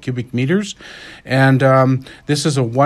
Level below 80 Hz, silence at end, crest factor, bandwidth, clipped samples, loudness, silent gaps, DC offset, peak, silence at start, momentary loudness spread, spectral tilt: -52 dBFS; 0 s; 16 dB; 12.5 kHz; under 0.1%; -16 LUFS; none; under 0.1%; 0 dBFS; 0 s; 18 LU; -6 dB/octave